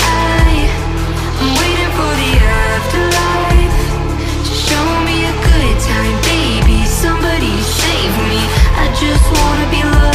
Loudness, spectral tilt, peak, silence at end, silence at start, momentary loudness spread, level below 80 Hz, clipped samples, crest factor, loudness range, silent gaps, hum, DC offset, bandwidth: -13 LUFS; -4.5 dB/octave; 0 dBFS; 0 s; 0 s; 5 LU; -14 dBFS; under 0.1%; 12 dB; 1 LU; none; none; under 0.1%; 15.5 kHz